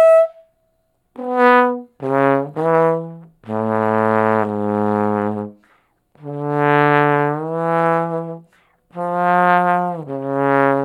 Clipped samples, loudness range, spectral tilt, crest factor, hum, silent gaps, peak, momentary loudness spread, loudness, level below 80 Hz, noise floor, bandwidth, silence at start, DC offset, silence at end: under 0.1%; 2 LU; -8 dB/octave; 18 dB; none; none; 0 dBFS; 14 LU; -17 LUFS; -70 dBFS; -65 dBFS; 11.5 kHz; 0 s; under 0.1%; 0 s